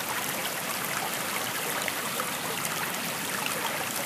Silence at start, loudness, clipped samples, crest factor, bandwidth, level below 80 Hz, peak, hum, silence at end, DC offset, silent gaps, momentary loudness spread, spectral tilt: 0 s; -29 LUFS; under 0.1%; 20 dB; 16 kHz; -70 dBFS; -10 dBFS; none; 0 s; under 0.1%; none; 1 LU; -1.5 dB/octave